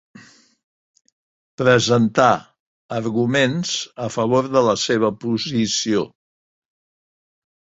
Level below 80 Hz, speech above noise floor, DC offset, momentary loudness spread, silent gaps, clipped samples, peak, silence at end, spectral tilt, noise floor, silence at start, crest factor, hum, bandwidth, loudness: -58 dBFS; over 72 dB; under 0.1%; 9 LU; 2.60-2.89 s; under 0.1%; -2 dBFS; 1.7 s; -4.5 dB/octave; under -90 dBFS; 1.6 s; 20 dB; none; 8 kHz; -19 LUFS